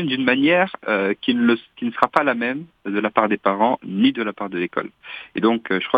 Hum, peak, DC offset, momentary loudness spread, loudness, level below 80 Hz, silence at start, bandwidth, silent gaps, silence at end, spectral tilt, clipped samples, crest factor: none; 0 dBFS; under 0.1%; 10 LU; -20 LUFS; -64 dBFS; 0 s; 5.2 kHz; none; 0 s; -7 dB/octave; under 0.1%; 20 dB